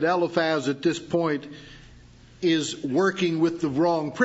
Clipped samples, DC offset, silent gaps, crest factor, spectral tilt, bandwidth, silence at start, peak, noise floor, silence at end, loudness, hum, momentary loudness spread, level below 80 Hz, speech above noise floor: under 0.1%; under 0.1%; none; 20 dB; -5 dB/octave; 8 kHz; 0 s; -6 dBFS; -50 dBFS; 0 s; -25 LUFS; none; 5 LU; -58 dBFS; 26 dB